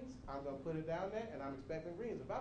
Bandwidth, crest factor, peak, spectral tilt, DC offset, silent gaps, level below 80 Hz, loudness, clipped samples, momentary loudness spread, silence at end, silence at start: 9.4 kHz; 14 dB; -30 dBFS; -7.5 dB/octave; under 0.1%; none; -62 dBFS; -45 LUFS; under 0.1%; 5 LU; 0 s; 0 s